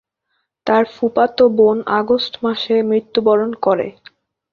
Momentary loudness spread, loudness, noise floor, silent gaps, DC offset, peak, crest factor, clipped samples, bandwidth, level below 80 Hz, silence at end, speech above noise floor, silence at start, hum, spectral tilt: 7 LU; -16 LUFS; -71 dBFS; none; under 0.1%; -2 dBFS; 16 dB; under 0.1%; 6.4 kHz; -58 dBFS; 0.6 s; 55 dB; 0.65 s; none; -7 dB/octave